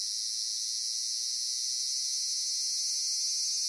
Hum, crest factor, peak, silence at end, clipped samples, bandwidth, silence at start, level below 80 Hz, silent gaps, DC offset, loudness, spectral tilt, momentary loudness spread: none; 14 dB; -18 dBFS; 0 s; under 0.1%; 11.5 kHz; 0 s; -84 dBFS; none; under 0.1%; -29 LUFS; 6.5 dB/octave; 2 LU